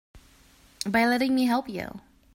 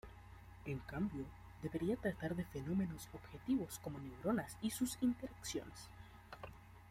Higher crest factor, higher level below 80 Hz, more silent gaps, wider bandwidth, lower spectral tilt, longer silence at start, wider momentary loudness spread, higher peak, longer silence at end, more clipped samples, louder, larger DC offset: about the same, 18 dB vs 18 dB; about the same, -58 dBFS vs -62 dBFS; neither; about the same, 16 kHz vs 16.5 kHz; about the same, -4.5 dB/octave vs -5.5 dB/octave; about the same, 0.15 s vs 0.05 s; second, 13 LU vs 16 LU; first, -10 dBFS vs -26 dBFS; first, 0.35 s vs 0 s; neither; first, -25 LUFS vs -43 LUFS; neither